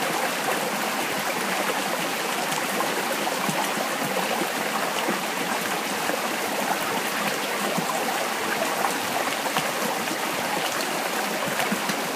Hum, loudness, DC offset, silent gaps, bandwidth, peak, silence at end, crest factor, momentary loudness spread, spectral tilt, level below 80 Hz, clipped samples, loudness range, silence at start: none; -25 LUFS; under 0.1%; none; 15.5 kHz; -8 dBFS; 0 s; 18 dB; 1 LU; -2 dB/octave; -72 dBFS; under 0.1%; 0 LU; 0 s